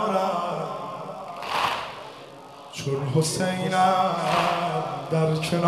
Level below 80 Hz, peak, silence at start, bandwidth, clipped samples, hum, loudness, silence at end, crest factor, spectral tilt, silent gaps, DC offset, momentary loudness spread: -62 dBFS; -8 dBFS; 0 s; 14 kHz; under 0.1%; none; -25 LUFS; 0 s; 18 dB; -5 dB/octave; none; under 0.1%; 16 LU